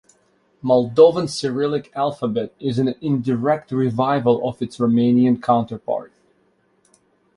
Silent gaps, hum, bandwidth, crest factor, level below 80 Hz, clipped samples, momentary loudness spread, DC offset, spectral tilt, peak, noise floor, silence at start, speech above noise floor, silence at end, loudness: none; none; 11 kHz; 18 dB; -60 dBFS; under 0.1%; 10 LU; under 0.1%; -7 dB/octave; -2 dBFS; -62 dBFS; 0.65 s; 43 dB; 1.3 s; -19 LUFS